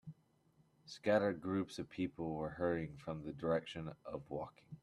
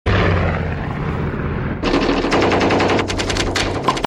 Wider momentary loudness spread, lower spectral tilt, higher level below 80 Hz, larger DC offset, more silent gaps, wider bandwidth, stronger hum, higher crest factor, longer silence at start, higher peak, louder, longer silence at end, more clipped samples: first, 13 LU vs 8 LU; first, -7 dB/octave vs -5.5 dB/octave; second, -68 dBFS vs -28 dBFS; neither; neither; about the same, 12 kHz vs 12 kHz; neither; first, 22 dB vs 14 dB; about the same, 0.05 s vs 0.05 s; second, -20 dBFS vs -4 dBFS; second, -40 LUFS vs -18 LUFS; about the same, 0.05 s vs 0 s; neither